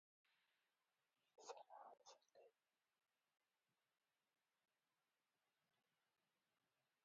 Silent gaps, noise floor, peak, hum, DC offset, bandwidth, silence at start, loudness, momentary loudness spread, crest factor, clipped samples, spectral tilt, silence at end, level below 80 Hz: none; under -90 dBFS; -44 dBFS; none; under 0.1%; 4.9 kHz; 0.25 s; -64 LUFS; 8 LU; 28 dB; under 0.1%; 0.5 dB/octave; 4.55 s; under -90 dBFS